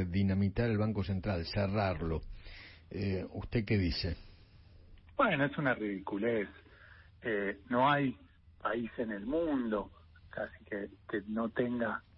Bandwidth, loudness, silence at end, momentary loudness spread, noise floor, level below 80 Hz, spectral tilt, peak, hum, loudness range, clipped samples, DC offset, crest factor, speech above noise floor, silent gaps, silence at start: 5.6 kHz; -34 LUFS; 0.15 s; 13 LU; -58 dBFS; -52 dBFS; -5.5 dB/octave; -16 dBFS; none; 3 LU; under 0.1%; under 0.1%; 18 dB; 24 dB; none; 0 s